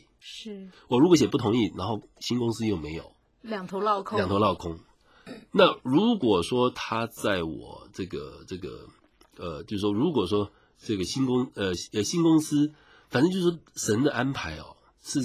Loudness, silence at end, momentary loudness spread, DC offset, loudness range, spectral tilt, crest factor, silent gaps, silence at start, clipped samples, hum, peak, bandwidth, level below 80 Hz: -26 LUFS; 0 s; 19 LU; under 0.1%; 6 LU; -5.5 dB/octave; 22 dB; none; 0.25 s; under 0.1%; none; -4 dBFS; 15.5 kHz; -52 dBFS